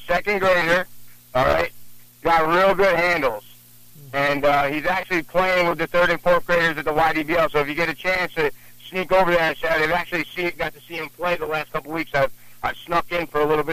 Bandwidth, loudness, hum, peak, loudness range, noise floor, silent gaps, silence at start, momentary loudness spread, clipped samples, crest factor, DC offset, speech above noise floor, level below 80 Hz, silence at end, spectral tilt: 15.5 kHz; -21 LUFS; none; -8 dBFS; 4 LU; -46 dBFS; none; 0 s; 10 LU; under 0.1%; 14 dB; under 0.1%; 26 dB; -44 dBFS; 0 s; -5 dB/octave